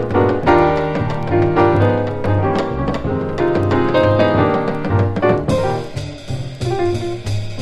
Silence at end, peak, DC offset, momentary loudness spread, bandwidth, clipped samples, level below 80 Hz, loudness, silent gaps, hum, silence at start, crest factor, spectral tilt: 0 s; 0 dBFS; under 0.1%; 10 LU; 11.5 kHz; under 0.1%; -34 dBFS; -17 LUFS; none; none; 0 s; 16 dB; -7.5 dB/octave